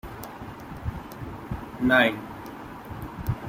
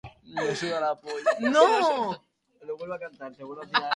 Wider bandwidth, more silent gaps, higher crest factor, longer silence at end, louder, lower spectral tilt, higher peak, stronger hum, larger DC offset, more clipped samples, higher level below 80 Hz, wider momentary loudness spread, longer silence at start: first, 16.5 kHz vs 11.5 kHz; neither; about the same, 22 dB vs 22 dB; about the same, 0 s vs 0 s; about the same, -26 LUFS vs -25 LUFS; first, -6 dB/octave vs -4 dB/octave; about the same, -6 dBFS vs -4 dBFS; neither; neither; neither; first, -44 dBFS vs -66 dBFS; about the same, 19 LU vs 20 LU; about the same, 0.05 s vs 0.05 s